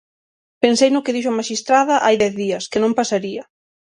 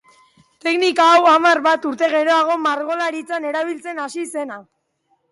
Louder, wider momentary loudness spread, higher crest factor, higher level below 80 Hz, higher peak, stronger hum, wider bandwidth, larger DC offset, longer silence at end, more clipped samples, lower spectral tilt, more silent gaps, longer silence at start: about the same, -17 LUFS vs -17 LUFS; second, 8 LU vs 15 LU; about the same, 18 dB vs 14 dB; first, -60 dBFS vs -72 dBFS; first, 0 dBFS vs -4 dBFS; neither; about the same, 11 kHz vs 11.5 kHz; neither; second, 0.55 s vs 0.7 s; neither; first, -3.5 dB/octave vs -2 dB/octave; neither; about the same, 0.6 s vs 0.65 s